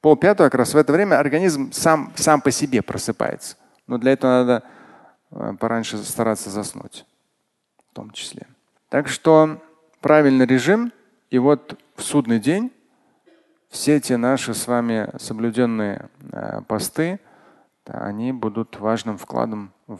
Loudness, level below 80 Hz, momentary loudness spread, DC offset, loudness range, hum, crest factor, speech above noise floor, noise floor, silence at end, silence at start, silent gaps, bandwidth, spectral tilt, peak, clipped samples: -20 LUFS; -58 dBFS; 17 LU; under 0.1%; 9 LU; none; 20 dB; 53 dB; -73 dBFS; 0 s; 0.05 s; none; 12.5 kHz; -5 dB/octave; 0 dBFS; under 0.1%